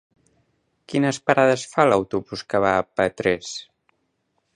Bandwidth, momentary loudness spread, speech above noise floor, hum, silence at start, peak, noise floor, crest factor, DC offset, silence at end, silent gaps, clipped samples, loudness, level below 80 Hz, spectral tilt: 11 kHz; 10 LU; 51 dB; none; 0.9 s; 0 dBFS; -72 dBFS; 22 dB; under 0.1%; 0.95 s; none; under 0.1%; -21 LUFS; -56 dBFS; -5 dB/octave